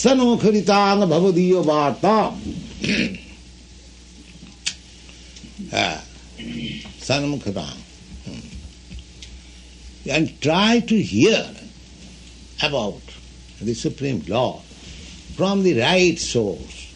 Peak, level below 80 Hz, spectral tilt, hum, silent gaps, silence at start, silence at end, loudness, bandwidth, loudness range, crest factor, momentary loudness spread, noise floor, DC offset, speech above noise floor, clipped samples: -4 dBFS; -44 dBFS; -5 dB/octave; none; none; 0 s; 0 s; -20 LUFS; 10.5 kHz; 10 LU; 18 dB; 24 LU; -43 dBFS; under 0.1%; 25 dB; under 0.1%